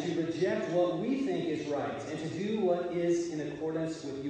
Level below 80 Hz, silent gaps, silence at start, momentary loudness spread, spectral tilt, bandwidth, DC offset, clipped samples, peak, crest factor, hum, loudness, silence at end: -68 dBFS; none; 0 s; 6 LU; -6 dB/octave; 9.2 kHz; under 0.1%; under 0.1%; -18 dBFS; 14 dB; none; -32 LUFS; 0 s